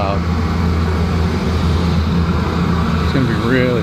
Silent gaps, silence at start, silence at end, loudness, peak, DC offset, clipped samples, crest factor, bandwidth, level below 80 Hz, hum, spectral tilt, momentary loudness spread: none; 0 s; 0 s; -16 LUFS; -2 dBFS; under 0.1%; under 0.1%; 14 dB; 9.6 kHz; -26 dBFS; none; -7.5 dB/octave; 2 LU